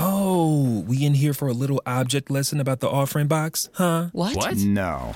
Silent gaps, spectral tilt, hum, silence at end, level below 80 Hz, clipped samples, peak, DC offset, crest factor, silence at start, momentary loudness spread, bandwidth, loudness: none; -5.5 dB/octave; none; 0 s; -50 dBFS; under 0.1%; -6 dBFS; under 0.1%; 16 dB; 0 s; 4 LU; 17 kHz; -22 LUFS